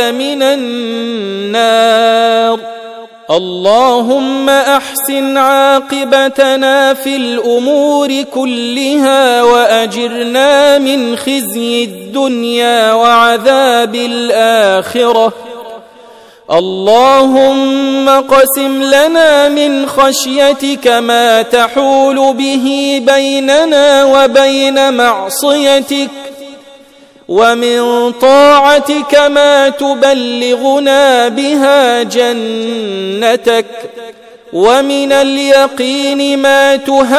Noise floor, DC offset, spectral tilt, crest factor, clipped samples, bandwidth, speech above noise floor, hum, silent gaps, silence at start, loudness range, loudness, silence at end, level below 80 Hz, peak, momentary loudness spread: -40 dBFS; under 0.1%; -2.5 dB/octave; 10 dB; under 0.1%; 16 kHz; 31 dB; none; none; 0 s; 4 LU; -9 LUFS; 0 s; -54 dBFS; 0 dBFS; 8 LU